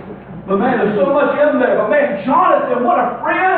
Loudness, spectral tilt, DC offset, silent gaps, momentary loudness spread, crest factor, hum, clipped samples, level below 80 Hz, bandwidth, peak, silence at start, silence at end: -14 LUFS; -10 dB/octave; under 0.1%; none; 4 LU; 12 dB; none; under 0.1%; -52 dBFS; 4.3 kHz; -2 dBFS; 0 s; 0 s